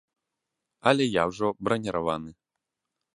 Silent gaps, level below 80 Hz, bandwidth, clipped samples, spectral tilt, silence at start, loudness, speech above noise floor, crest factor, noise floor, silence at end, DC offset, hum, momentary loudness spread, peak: none; -60 dBFS; 11.5 kHz; under 0.1%; -5.5 dB/octave; 0.85 s; -26 LUFS; 59 dB; 26 dB; -85 dBFS; 0.85 s; under 0.1%; none; 9 LU; -4 dBFS